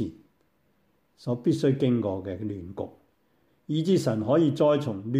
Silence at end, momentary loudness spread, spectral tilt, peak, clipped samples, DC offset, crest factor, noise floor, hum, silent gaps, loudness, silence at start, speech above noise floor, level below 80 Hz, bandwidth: 0 s; 14 LU; -7.5 dB/octave; -10 dBFS; under 0.1%; under 0.1%; 16 dB; -69 dBFS; none; none; -26 LUFS; 0 s; 44 dB; -64 dBFS; 15 kHz